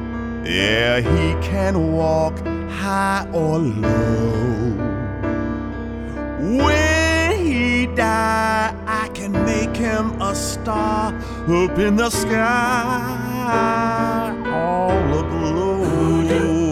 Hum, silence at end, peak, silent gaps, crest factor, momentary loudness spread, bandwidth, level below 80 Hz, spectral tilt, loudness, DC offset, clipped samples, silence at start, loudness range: none; 0 s; -4 dBFS; none; 16 dB; 8 LU; 15.5 kHz; -32 dBFS; -5.5 dB/octave; -19 LUFS; under 0.1%; under 0.1%; 0 s; 3 LU